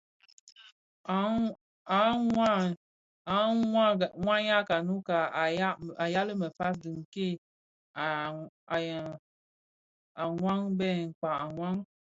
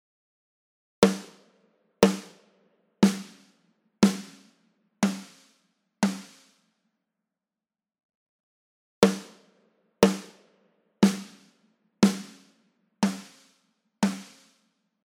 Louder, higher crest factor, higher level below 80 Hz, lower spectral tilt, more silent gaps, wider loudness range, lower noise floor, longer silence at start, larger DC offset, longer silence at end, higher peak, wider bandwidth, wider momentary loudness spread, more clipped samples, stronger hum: second, -30 LUFS vs -26 LUFS; second, 20 dB vs 28 dB; about the same, -66 dBFS vs -62 dBFS; about the same, -6.5 dB/octave vs -5.5 dB/octave; first, 0.72-1.04 s, 1.61-1.85 s, 2.77-3.25 s, 7.05-7.12 s, 7.38-7.94 s, 8.49-8.67 s, 9.19-10.15 s, 11.15-11.22 s vs 8.03-8.09 s, 8.15-9.02 s; about the same, 8 LU vs 7 LU; about the same, under -90 dBFS vs under -90 dBFS; second, 0.6 s vs 1 s; neither; second, 0.25 s vs 0.85 s; second, -12 dBFS vs -2 dBFS; second, 7.8 kHz vs 16 kHz; second, 14 LU vs 17 LU; neither; neither